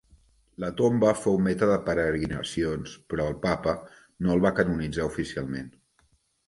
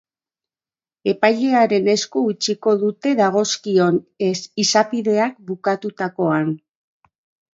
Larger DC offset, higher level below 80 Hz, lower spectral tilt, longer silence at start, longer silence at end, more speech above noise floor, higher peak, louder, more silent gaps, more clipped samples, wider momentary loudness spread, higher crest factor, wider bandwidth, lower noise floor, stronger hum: neither; first, -48 dBFS vs -70 dBFS; first, -6.5 dB/octave vs -4.5 dB/octave; second, 0.6 s vs 1.05 s; second, 0.8 s vs 1 s; second, 41 dB vs over 72 dB; second, -6 dBFS vs 0 dBFS; second, -27 LUFS vs -19 LUFS; neither; neither; first, 12 LU vs 7 LU; about the same, 20 dB vs 20 dB; first, 11.5 kHz vs 7.8 kHz; second, -67 dBFS vs under -90 dBFS; neither